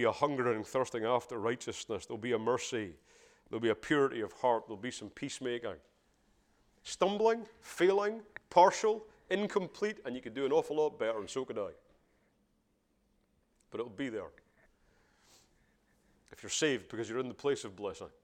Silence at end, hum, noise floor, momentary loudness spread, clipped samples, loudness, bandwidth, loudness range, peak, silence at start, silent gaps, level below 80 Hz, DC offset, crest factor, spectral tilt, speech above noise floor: 0.15 s; none; -75 dBFS; 13 LU; under 0.1%; -34 LUFS; 15 kHz; 15 LU; -10 dBFS; 0 s; none; -72 dBFS; under 0.1%; 26 dB; -4 dB/octave; 42 dB